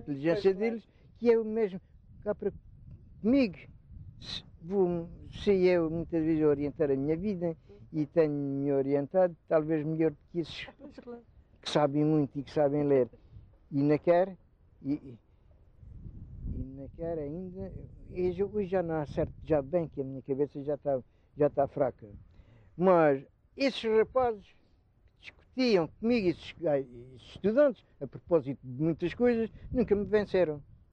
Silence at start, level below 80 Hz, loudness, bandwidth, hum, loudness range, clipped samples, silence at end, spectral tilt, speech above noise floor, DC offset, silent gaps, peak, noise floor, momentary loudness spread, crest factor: 0 s; -54 dBFS; -30 LUFS; 9 kHz; none; 5 LU; under 0.1%; 0.3 s; -8 dB/octave; 35 dB; under 0.1%; none; -12 dBFS; -64 dBFS; 16 LU; 20 dB